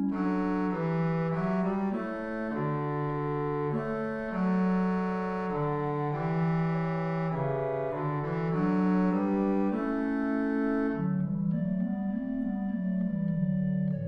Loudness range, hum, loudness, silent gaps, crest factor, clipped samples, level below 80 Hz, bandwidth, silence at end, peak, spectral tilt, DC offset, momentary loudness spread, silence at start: 2 LU; none; -30 LUFS; none; 12 dB; under 0.1%; -54 dBFS; 5.4 kHz; 0 s; -16 dBFS; -10 dB/octave; under 0.1%; 5 LU; 0 s